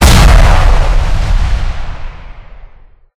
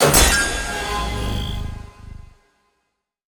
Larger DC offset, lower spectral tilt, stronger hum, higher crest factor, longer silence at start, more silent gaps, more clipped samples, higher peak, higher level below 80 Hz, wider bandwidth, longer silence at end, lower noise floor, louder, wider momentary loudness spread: neither; first, -4.5 dB/octave vs -2.5 dB/octave; neither; second, 8 dB vs 20 dB; about the same, 0 s vs 0 s; neither; first, 5% vs under 0.1%; about the same, 0 dBFS vs 0 dBFS; first, -10 dBFS vs -28 dBFS; second, 16 kHz vs over 20 kHz; second, 0.55 s vs 1.15 s; second, -38 dBFS vs -74 dBFS; first, -11 LUFS vs -19 LUFS; second, 20 LU vs 25 LU